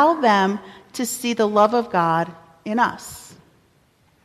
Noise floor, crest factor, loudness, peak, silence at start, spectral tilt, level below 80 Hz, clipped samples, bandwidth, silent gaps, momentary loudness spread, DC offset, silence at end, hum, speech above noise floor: -59 dBFS; 18 dB; -20 LUFS; -4 dBFS; 0 s; -4.5 dB/octave; -62 dBFS; under 0.1%; 14.5 kHz; none; 19 LU; under 0.1%; 1 s; none; 40 dB